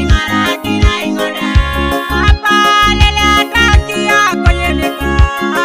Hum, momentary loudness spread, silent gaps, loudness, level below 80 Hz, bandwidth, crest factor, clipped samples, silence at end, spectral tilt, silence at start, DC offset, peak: none; 6 LU; none; -11 LUFS; -16 dBFS; 16 kHz; 10 dB; 1%; 0 s; -4.5 dB/octave; 0 s; 0.8%; 0 dBFS